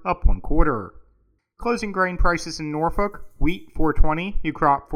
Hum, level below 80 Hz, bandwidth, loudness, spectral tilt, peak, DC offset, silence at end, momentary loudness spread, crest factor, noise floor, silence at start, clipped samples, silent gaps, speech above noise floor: none; -24 dBFS; 9.8 kHz; -24 LUFS; -6 dB/octave; -2 dBFS; under 0.1%; 0 s; 7 LU; 18 dB; -63 dBFS; 0 s; under 0.1%; none; 44 dB